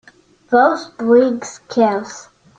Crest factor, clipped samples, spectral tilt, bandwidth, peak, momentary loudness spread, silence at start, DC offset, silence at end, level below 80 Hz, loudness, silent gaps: 16 dB; under 0.1%; -5 dB/octave; 8.8 kHz; -2 dBFS; 14 LU; 0.5 s; under 0.1%; 0.35 s; -62 dBFS; -16 LUFS; none